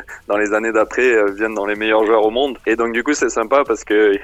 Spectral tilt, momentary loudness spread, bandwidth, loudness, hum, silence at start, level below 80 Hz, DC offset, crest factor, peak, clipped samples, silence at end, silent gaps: -3 dB/octave; 5 LU; 10.5 kHz; -16 LUFS; none; 0 s; -48 dBFS; under 0.1%; 16 dB; -2 dBFS; under 0.1%; 0 s; none